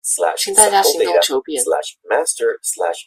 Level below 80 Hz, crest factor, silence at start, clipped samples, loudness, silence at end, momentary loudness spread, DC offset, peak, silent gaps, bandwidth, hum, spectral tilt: -62 dBFS; 16 dB; 0.05 s; under 0.1%; -15 LUFS; 0.05 s; 9 LU; under 0.1%; 0 dBFS; none; 16 kHz; none; 0.5 dB/octave